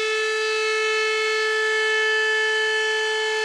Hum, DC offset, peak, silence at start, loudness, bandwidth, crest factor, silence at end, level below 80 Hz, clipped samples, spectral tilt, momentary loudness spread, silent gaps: none; under 0.1%; -12 dBFS; 0 s; -20 LUFS; 12.5 kHz; 10 dB; 0 s; -72 dBFS; under 0.1%; 2 dB/octave; 3 LU; none